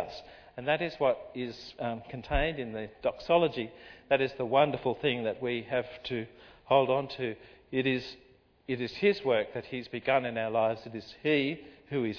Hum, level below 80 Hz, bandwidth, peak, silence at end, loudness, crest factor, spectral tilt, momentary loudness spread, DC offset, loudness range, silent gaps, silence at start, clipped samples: none; -50 dBFS; 5.4 kHz; -10 dBFS; 0 s; -31 LUFS; 20 dB; -7 dB/octave; 13 LU; under 0.1%; 3 LU; none; 0 s; under 0.1%